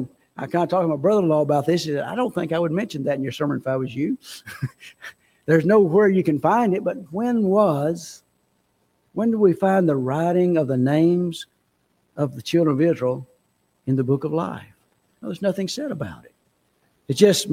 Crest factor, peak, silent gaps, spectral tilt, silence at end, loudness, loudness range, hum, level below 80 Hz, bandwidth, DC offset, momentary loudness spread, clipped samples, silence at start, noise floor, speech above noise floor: 20 dB; -2 dBFS; none; -6.5 dB/octave; 0 s; -21 LUFS; 7 LU; none; -62 dBFS; 16.5 kHz; under 0.1%; 17 LU; under 0.1%; 0 s; -67 dBFS; 47 dB